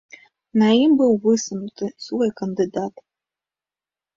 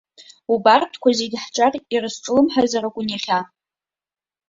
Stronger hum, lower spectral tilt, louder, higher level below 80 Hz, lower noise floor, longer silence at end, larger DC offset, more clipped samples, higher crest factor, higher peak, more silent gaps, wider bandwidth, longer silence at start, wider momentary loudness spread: neither; first, -5.5 dB/octave vs -3.5 dB/octave; about the same, -20 LUFS vs -19 LUFS; about the same, -64 dBFS vs -62 dBFS; about the same, under -90 dBFS vs under -90 dBFS; first, 1.25 s vs 1.05 s; neither; neither; about the same, 16 dB vs 18 dB; second, -6 dBFS vs -2 dBFS; neither; about the same, 7.6 kHz vs 7.8 kHz; about the same, 0.55 s vs 0.5 s; first, 14 LU vs 10 LU